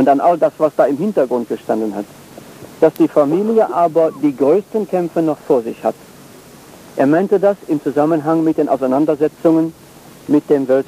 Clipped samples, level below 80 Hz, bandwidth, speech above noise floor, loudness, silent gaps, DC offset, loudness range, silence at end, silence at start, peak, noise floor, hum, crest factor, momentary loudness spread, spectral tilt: under 0.1%; -60 dBFS; 15.5 kHz; 25 dB; -16 LUFS; none; under 0.1%; 2 LU; 0.05 s; 0 s; -2 dBFS; -40 dBFS; none; 14 dB; 9 LU; -7.5 dB/octave